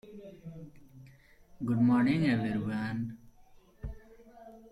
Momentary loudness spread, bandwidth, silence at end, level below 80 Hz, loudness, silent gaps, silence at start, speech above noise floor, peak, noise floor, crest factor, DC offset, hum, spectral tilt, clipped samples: 26 LU; 11.5 kHz; 0.15 s; -56 dBFS; -30 LUFS; none; 0.05 s; 30 dB; -16 dBFS; -58 dBFS; 16 dB; under 0.1%; none; -8 dB/octave; under 0.1%